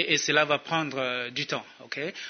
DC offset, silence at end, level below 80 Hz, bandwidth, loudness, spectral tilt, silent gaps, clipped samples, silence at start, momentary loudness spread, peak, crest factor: under 0.1%; 0 s; -76 dBFS; 6.6 kHz; -27 LUFS; -2.5 dB/octave; none; under 0.1%; 0 s; 12 LU; -6 dBFS; 22 dB